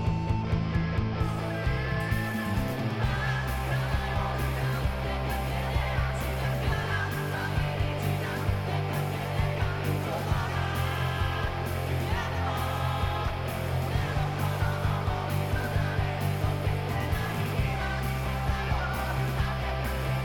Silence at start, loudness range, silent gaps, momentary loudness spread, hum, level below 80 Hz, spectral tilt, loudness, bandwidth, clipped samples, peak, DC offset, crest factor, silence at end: 0 s; 1 LU; none; 2 LU; none; -36 dBFS; -6 dB/octave; -30 LUFS; 18 kHz; under 0.1%; -14 dBFS; under 0.1%; 14 dB; 0 s